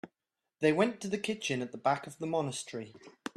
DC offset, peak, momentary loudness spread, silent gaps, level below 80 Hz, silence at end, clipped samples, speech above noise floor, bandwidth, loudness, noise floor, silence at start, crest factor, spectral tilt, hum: under 0.1%; -14 dBFS; 16 LU; none; -74 dBFS; 0.05 s; under 0.1%; 56 dB; 13 kHz; -33 LUFS; -88 dBFS; 0.05 s; 20 dB; -4.5 dB/octave; none